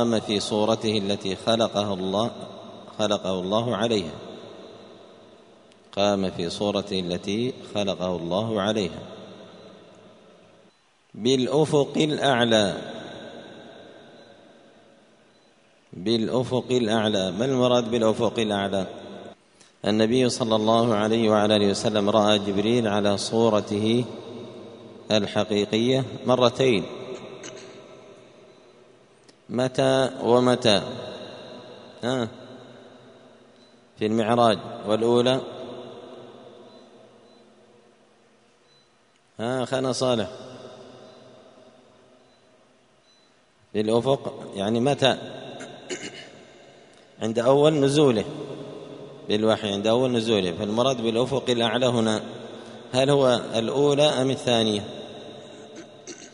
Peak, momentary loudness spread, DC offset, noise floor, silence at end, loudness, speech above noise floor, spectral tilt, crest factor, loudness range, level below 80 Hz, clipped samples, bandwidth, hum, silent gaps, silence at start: -2 dBFS; 21 LU; under 0.1%; -61 dBFS; 0.05 s; -23 LUFS; 39 dB; -5 dB/octave; 22 dB; 8 LU; -62 dBFS; under 0.1%; 10.5 kHz; none; none; 0 s